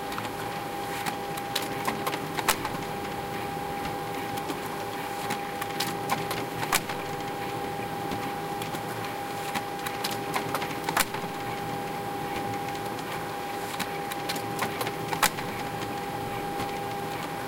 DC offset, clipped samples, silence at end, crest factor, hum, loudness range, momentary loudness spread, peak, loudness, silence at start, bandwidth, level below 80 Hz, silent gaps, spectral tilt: under 0.1%; under 0.1%; 0 s; 26 dB; none; 2 LU; 6 LU; -4 dBFS; -31 LUFS; 0 s; 17 kHz; -56 dBFS; none; -3.5 dB/octave